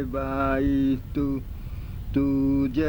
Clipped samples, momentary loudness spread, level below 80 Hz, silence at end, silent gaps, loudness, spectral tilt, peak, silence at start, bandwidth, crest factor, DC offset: under 0.1%; 14 LU; -36 dBFS; 0 s; none; -25 LUFS; -9 dB/octave; -12 dBFS; 0 s; over 20 kHz; 12 dB; under 0.1%